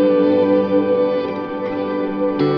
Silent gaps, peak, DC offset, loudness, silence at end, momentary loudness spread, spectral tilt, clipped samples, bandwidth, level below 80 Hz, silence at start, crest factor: none; -4 dBFS; under 0.1%; -18 LUFS; 0 s; 9 LU; -9.5 dB/octave; under 0.1%; 5.4 kHz; -56 dBFS; 0 s; 12 dB